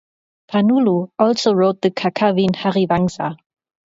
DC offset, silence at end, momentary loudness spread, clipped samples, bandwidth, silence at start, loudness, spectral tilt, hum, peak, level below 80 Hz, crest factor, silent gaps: under 0.1%; 0.6 s; 6 LU; under 0.1%; 7.8 kHz; 0.5 s; -17 LUFS; -6.5 dB/octave; none; 0 dBFS; -54 dBFS; 16 dB; none